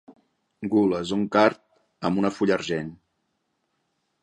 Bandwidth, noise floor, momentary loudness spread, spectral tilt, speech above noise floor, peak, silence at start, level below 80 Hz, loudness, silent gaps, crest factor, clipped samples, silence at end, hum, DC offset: 9.4 kHz; -75 dBFS; 13 LU; -6 dB/octave; 52 dB; -2 dBFS; 0.1 s; -60 dBFS; -24 LUFS; none; 24 dB; under 0.1%; 1.3 s; none; under 0.1%